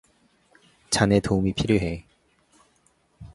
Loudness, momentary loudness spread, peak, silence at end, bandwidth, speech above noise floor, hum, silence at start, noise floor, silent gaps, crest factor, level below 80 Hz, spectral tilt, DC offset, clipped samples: -23 LUFS; 10 LU; -2 dBFS; 0 s; 11.5 kHz; 43 dB; none; 0.9 s; -65 dBFS; none; 24 dB; -44 dBFS; -5 dB/octave; under 0.1%; under 0.1%